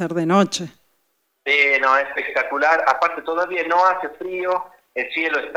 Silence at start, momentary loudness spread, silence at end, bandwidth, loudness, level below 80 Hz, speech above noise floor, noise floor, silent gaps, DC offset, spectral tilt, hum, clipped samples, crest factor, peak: 0 s; 12 LU; 0 s; over 20 kHz; -19 LUFS; -66 dBFS; 49 dB; -69 dBFS; none; under 0.1%; -4.5 dB/octave; none; under 0.1%; 18 dB; -2 dBFS